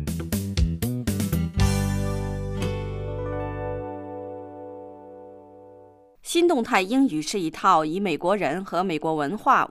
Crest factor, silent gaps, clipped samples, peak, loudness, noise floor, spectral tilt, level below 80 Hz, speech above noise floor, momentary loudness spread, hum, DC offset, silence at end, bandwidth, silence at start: 20 dB; none; under 0.1%; -6 dBFS; -25 LUFS; -51 dBFS; -5.5 dB/octave; -36 dBFS; 28 dB; 19 LU; none; under 0.1%; 0 s; 15.5 kHz; 0 s